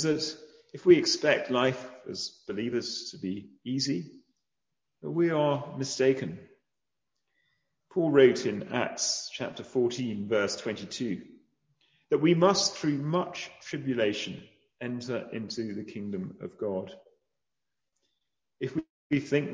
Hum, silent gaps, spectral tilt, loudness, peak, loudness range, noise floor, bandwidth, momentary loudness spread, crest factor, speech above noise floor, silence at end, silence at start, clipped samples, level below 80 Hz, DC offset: none; 18.90-19.10 s; -4.5 dB/octave; -29 LUFS; -8 dBFS; 9 LU; -89 dBFS; 7.8 kHz; 16 LU; 22 dB; 60 dB; 0 s; 0 s; under 0.1%; -70 dBFS; under 0.1%